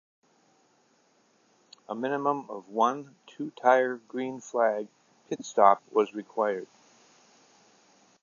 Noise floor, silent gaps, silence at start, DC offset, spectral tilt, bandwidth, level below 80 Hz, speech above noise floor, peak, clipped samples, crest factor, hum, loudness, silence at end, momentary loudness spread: -66 dBFS; none; 1.9 s; under 0.1%; -5 dB/octave; 7.4 kHz; -88 dBFS; 39 dB; -4 dBFS; under 0.1%; 26 dB; none; -28 LUFS; 1.6 s; 17 LU